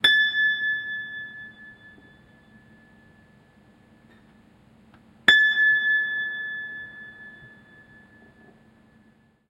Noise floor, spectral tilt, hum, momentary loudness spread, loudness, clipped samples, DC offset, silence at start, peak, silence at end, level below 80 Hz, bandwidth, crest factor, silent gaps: -59 dBFS; -1 dB/octave; none; 25 LU; -21 LUFS; under 0.1%; under 0.1%; 0.05 s; -2 dBFS; 2 s; -66 dBFS; 16 kHz; 26 dB; none